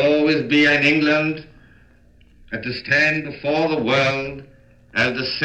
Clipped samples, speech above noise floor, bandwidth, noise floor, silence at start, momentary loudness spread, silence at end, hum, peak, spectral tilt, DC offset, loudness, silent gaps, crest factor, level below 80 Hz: under 0.1%; 33 dB; 8.4 kHz; -52 dBFS; 0 s; 14 LU; 0 s; none; -4 dBFS; -5.5 dB/octave; under 0.1%; -18 LUFS; none; 16 dB; -52 dBFS